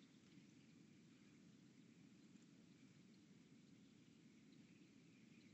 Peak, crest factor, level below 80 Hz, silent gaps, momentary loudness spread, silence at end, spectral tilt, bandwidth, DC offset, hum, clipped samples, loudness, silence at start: -54 dBFS; 14 dB; under -90 dBFS; none; 1 LU; 0 s; -5.5 dB/octave; 8 kHz; under 0.1%; none; under 0.1%; -69 LUFS; 0 s